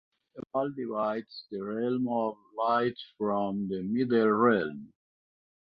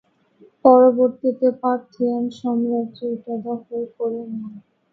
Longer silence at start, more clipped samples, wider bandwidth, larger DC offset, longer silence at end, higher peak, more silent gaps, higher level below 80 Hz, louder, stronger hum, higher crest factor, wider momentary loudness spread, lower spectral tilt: second, 0.35 s vs 0.65 s; neither; second, 5.2 kHz vs 6 kHz; neither; first, 0.9 s vs 0.35 s; second, -10 dBFS vs 0 dBFS; neither; about the same, -72 dBFS vs -68 dBFS; second, -30 LUFS vs -20 LUFS; neither; about the same, 20 dB vs 20 dB; second, 13 LU vs 16 LU; about the same, -9.5 dB/octave vs -8.5 dB/octave